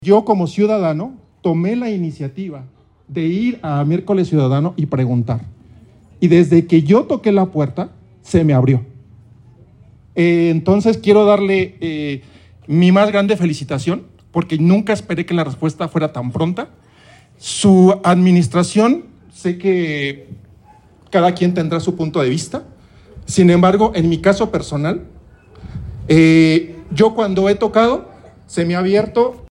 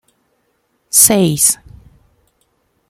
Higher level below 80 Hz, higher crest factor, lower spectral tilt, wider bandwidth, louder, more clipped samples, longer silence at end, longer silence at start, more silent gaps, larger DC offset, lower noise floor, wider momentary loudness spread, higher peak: about the same, -46 dBFS vs -48 dBFS; about the same, 14 dB vs 18 dB; first, -7 dB/octave vs -3 dB/octave; second, 11 kHz vs over 20 kHz; second, -15 LUFS vs -10 LUFS; second, under 0.1% vs 0.2%; second, 0.05 s vs 1.35 s; second, 0 s vs 0.95 s; neither; neither; second, -47 dBFS vs -63 dBFS; first, 14 LU vs 6 LU; about the same, 0 dBFS vs 0 dBFS